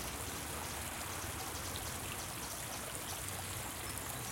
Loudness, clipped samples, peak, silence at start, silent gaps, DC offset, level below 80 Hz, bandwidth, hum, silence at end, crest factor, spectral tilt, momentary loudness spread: -41 LUFS; under 0.1%; -22 dBFS; 0 s; none; under 0.1%; -56 dBFS; 17 kHz; none; 0 s; 22 dB; -2.5 dB/octave; 1 LU